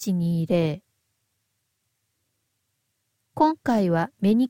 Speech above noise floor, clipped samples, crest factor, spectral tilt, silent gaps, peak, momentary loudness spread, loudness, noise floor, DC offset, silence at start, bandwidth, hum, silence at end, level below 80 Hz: 54 dB; under 0.1%; 18 dB; -7.5 dB/octave; none; -8 dBFS; 8 LU; -23 LUFS; -75 dBFS; under 0.1%; 0 s; 16.5 kHz; none; 0 s; -62 dBFS